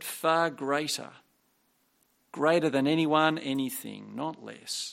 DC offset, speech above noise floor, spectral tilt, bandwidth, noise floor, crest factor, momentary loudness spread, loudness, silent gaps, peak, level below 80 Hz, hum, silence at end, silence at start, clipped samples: under 0.1%; 43 dB; -4 dB/octave; 16.5 kHz; -71 dBFS; 20 dB; 14 LU; -28 LUFS; none; -8 dBFS; -78 dBFS; none; 0 s; 0 s; under 0.1%